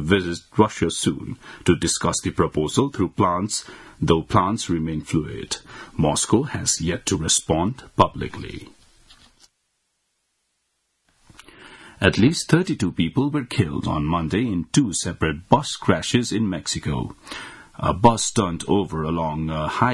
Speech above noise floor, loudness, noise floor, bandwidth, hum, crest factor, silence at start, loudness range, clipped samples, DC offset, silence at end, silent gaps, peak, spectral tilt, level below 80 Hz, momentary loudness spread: 51 dB; -22 LUFS; -72 dBFS; 12 kHz; none; 22 dB; 0 s; 3 LU; under 0.1%; under 0.1%; 0 s; none; 0 dBFS; -4.5 dB/octave; -46 dBFS; 11 LU